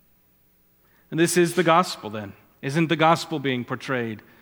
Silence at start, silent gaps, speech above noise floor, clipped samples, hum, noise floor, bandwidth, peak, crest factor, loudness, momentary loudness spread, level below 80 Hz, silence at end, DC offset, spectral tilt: 1.1 s; none; 39 dB; under 0.1%; none; -61 dBFS; 19.5 kHz; -2 dBFS; 22 dB; -22 LUFS; 15 LU; -70 dBFS; 0.2 s; under 0.1%; -5 dB/octave